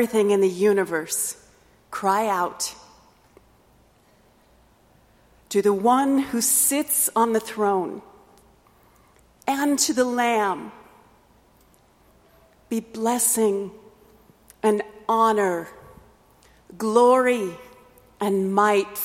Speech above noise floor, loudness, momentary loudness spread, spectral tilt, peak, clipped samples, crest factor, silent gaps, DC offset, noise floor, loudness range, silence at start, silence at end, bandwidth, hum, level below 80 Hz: 36 dB; -22 LUFS; 13 LU; -3.5 dB/octave; -4 dBFS; under 0.1%; 20 dB; none; under 0.1%; -58 dBFS; 7 LU; 0 s; 0 s; 16.5 kHz; none; -62 dBFS